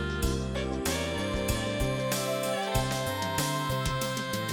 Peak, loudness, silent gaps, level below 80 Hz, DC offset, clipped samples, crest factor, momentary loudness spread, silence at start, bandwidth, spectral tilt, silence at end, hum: -12 dBFS; -30 LUFS; none; -40 dBFS; under 0.1%; under 0.1%; 18 dB; 2 LU; 0 s; 17.5 kHz; -4 dB/octave; 0 s; none